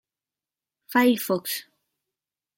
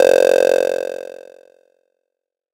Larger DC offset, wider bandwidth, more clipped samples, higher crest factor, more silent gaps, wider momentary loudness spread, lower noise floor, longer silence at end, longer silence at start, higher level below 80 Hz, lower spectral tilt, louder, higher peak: neither; about the same, 17 kHz vs 17 kHz; neither; about the same, 20 dB vs 16 dB; neither; second, 11 LU vs 19 LU; first, under -90 dBFS vs -81 dBFS; second, 0.95 s vs 1.4 s; first, 0.9 s vs 0 s; second, -78 dBFS vs -60 dBFS; first, -4 dB/octave vs -2.5 dB/octave; second, -24 LUFS vs -15 LUFS; second, -8 dBFS vs -2 dBFS